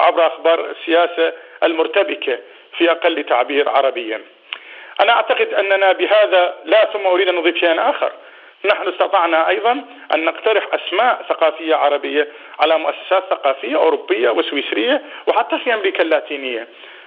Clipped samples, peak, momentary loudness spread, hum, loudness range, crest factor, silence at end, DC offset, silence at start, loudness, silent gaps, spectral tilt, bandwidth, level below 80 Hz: under 0.1%; 0 dBFS; 9 LU; none; 3 LU; 16 dB; 0.05 s; under 0.1%; 0 s; -16 LUFS; none; -4 dB/octave; 5 kHz; -86 dBFS